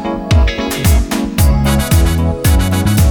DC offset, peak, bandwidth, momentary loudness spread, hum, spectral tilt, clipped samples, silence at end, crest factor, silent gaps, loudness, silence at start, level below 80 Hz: under 0.1%; -2 dBFS; over 20 kHz; 3 LU; none; -5.5 dB/octave; under 0.1%; 0 s; 10 dB; none; -13 LUFS; 0 s; -16 dBFS